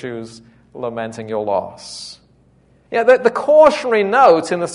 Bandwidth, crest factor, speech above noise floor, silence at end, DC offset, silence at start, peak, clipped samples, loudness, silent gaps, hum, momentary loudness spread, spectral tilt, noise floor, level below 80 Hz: 11 kHz; 16 dB; 38 dB; 0 s; under 0.1%; 0.05 s; 0 dBFS; under 0.1%; -14 LUFS; none; none; 20 LU; -4.5 dB/octave; -53 dBFS; -56 dBFS